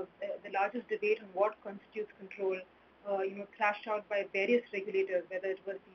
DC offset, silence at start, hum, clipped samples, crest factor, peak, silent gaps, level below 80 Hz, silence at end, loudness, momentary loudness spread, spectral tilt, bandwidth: under 0.1%; 0 s; none; under 0.1%; 20 dB; -16 dBFS; none; -82 dBFS; 0.15 s; -35 LUFS; 11 LU; -2.5 dB/octave; 6.4 kHz